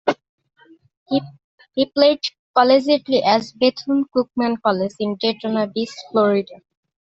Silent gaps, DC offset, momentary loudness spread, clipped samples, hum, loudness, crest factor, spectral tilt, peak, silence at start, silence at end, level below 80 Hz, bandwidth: 0.29-0.38 s, 0.97-1.06 s, 1.44-1.58 s, 2.39-2.54 s; under 0.1%; 8 LU; under 0.1%; none; -19 LUFS; 18 dB; -5.5 dB/octave; -2 dBFS; 0.05 s; 0.5 s; -64 dBFS; 8 kHz